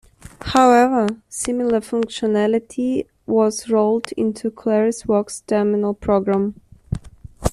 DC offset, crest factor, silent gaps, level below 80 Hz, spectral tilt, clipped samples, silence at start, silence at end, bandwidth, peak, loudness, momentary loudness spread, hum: under 0.1%; 16 dB; none; -42 dBFS; -5.5 dB/octave; under 0.1%; 0.4 s; 0 s; 13 kHz; -2 dBFS; -19 LUFS; 11 LU; none